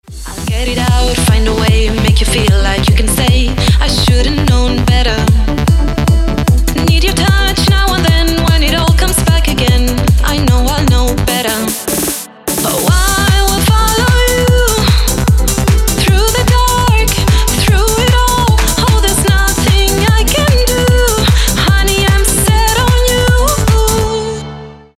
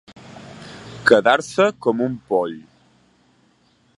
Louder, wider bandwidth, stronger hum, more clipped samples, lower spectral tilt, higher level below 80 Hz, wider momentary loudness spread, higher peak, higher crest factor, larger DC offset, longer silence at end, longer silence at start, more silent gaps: first, -11 LUFS vs -18 LUFS; first, 16.5 kHz vs 11.5 kHz; neither; neither; about the same, -4.5 dB/octave vs -4.5 dB/octave; first, -14 dBFS vs -62 dBFS; second, 3 LU vs 24 LU; about the same, 0 dBFS vs 0 dBFS; second, 8 dB vs 22 dB; neither; second, 0.25 s vs 1.4 s; second, 0.1 s vs 0.3 s; neither